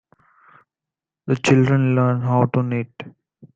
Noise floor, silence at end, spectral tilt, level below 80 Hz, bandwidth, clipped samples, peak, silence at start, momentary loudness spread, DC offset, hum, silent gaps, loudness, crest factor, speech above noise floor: -88 dBFS; 0.45 s; -7 dB/octave; -58 dBFS; 8 kHz; under 0.1%; -2 dBFS; 1.25 s; 21 LU; under 0.1%; none; none; -19 LUFS; 18 dB; 70 dB